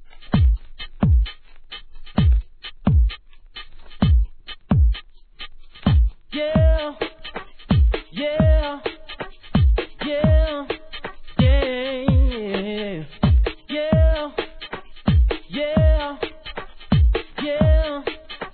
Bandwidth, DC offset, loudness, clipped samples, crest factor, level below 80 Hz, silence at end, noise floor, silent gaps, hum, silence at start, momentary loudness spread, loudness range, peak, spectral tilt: 4.5 kHz; 0.2%; -21 LUFS; under 0.1%; 16 dB; -22 dBFS; 0.05 s; -40 dBFS; none; none; 0.05 s; 17 LU; 2 LU; -4 dBFS; -11 dB/octave